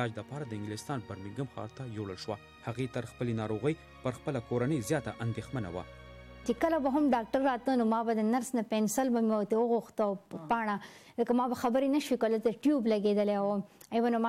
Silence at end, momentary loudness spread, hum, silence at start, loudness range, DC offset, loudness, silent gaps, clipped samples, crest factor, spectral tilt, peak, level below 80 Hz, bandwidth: 0 s; 12 LU; none; 0 s; 7 LU; under 0.1%; -32 LUFS; none; under 0.1%; 14 dB; -6 dB/octave; -18 dBFS; -62 dBFS; 16 kHz